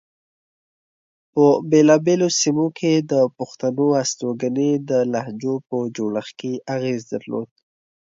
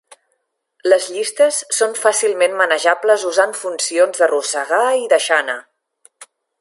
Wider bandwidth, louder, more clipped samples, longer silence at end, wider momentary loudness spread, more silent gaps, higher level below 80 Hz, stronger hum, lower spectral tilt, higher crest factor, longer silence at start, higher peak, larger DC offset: second, 7.8 kHz vs 11.5 kHz; second, -20 LUFS vs -16 LUFS; neither; first, 0.75 s vs 0.35 s; first, 12 LU vs 5 LU; neither; first, -68 dBFS vs -78 dBFS; neither; first, -5 dB/octave vs 0.5 dB/octave; about the same, 18 dB vs 16 dB; first, 1.35 s vs 0.85 s; about the same, -2 dBFS vs 0 dBFS; neither